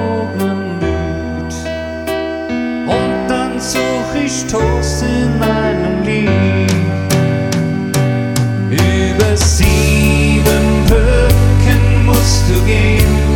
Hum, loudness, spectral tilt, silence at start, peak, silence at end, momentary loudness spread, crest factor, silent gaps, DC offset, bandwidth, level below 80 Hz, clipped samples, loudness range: none; -13 LUFS; -5.5 dB/octave; 0 s; 0 dBFS; 0 s; 8 LU; 12 dB; none; under 0.1%; 17.5 kHz; -18 dBFS; under 0.1%; 7 LU